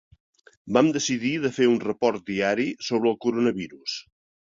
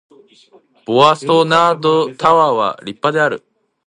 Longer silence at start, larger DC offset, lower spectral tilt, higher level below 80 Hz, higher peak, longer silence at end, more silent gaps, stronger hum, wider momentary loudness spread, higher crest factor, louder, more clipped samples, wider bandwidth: second, 0.65 s vs 0.9 s; neither; about the same, -4.5 dB/octave vs -5 dB/octave; about the same, -64 dBFS vs -62 dBFS; second, -4 dBFS vs 0 dBFS; about the same, 0.5 s vs 0.5 s; neither; neither; about the same, 10 LU vs 9 LU; about the same, 20 dB vs 16 dB; second, -24 LUFS vs -14 LUFS; neither; second, 7.6 kHz vs 10.5 kHz